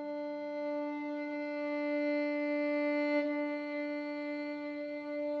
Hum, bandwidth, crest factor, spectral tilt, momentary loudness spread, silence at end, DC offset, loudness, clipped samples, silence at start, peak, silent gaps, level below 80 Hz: none; 6 kHz; 14 dB; -5.5 dB/octave; 7 LU; 0 s; under 0.1%; -36 LUFS; under 0.1%; 0 s; -22 dBFS; none; -86 dBFS